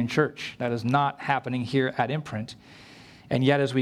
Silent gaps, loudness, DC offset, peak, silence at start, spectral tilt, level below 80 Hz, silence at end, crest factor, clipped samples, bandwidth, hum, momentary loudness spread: none; -26 LUFS; under 0.1%; -8 dBFS; 0 s; -6.5 dB/octave; -64 dBFS; 0 s; 20 dB; under 0.1%; 12.5 kHz; none; 13 LU